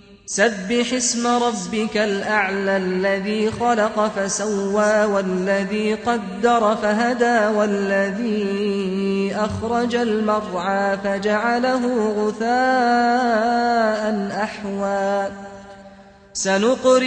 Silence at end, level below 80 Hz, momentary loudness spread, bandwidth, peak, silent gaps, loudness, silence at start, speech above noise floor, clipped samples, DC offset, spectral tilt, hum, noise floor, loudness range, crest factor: 0 s; -54 dBFS; 6 LU; 9.4 kHz; -4 dBFS; none; -20 LUFS; 0.1 s; 25 dB; under 0.1%; under 0.1%; -4 dB/octave; none; -44 dBFS; 2 LU; 16 dB